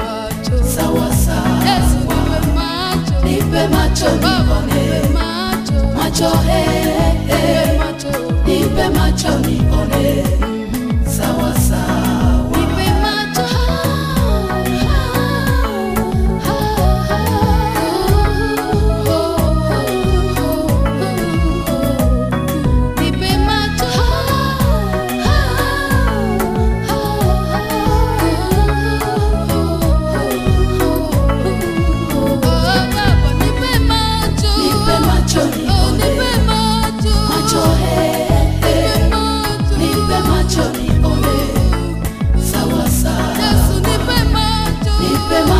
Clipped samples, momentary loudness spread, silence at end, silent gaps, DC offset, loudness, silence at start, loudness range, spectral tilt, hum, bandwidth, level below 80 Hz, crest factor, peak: under 0.1%; 3 LU; 0 s; none; under 0.1%; -15 LUFS; 0 s; 2 LU; -5.5 dB/octave; none; 15.5 kHz; -20 dBFS; 14 dB; 0 dBFS